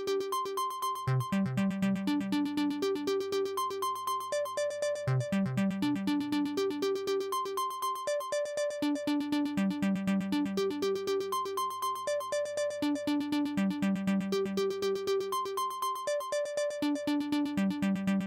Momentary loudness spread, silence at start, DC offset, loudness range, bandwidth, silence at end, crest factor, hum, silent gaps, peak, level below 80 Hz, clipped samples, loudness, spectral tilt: 3 LU; 0 s; under 0.1%; 1 LU; 16.5 kHz; 0 s; 12 dB; none; none; -20 dBFS; -68 dBFS; under 0.1%; -32 LUFS; -5.5 dB/octave